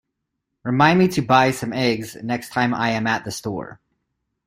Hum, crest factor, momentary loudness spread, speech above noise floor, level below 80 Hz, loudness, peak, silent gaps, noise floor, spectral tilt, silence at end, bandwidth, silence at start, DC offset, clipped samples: none; 20 dB; 13 LU; 59 dB; -56 dBFS; -20 LUFS; -2 dBFS; none; -78 dBFS; -5.5 dB/octave; 0.7 s; 16 kHz; 0.65 s; under 0.1%; under 0.1%